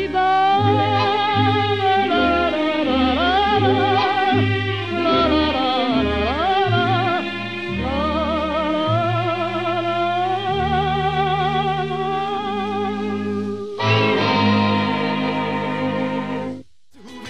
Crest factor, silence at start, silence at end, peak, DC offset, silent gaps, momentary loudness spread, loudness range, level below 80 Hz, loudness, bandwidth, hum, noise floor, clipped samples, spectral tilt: 16 dB; 0 s; 0 s; -4 dBFS; 0.6%; none; 7 LU; 4 LU; -40 dBFS; -19 LUFS; 9.2 kHz; none; -45 dBFS; under 0.1%; -6.5 dB/octave